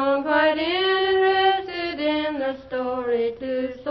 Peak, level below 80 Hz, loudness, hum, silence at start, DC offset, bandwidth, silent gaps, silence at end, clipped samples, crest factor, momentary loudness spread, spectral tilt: -6 dBFS; -56 dBFS; -22 LUFS; none; 0 s; under 0.1%; 5.8 kHz; none; 0 s; under 0.1%; 16 dB; 9 LU; -6.5 dB/octave